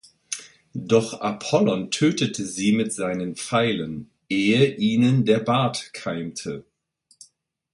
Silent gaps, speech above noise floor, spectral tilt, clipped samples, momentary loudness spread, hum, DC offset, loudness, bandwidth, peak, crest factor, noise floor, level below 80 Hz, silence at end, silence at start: none; 42 dB; -5 dB/octave; under 0.1%; 14 LU; none; under 0.1%; -23 LUFS; 11.5 kHz; -4 dBFS; 18 dB; -63 dBFS; -60 dBFS; 1.1 s; 0.3 s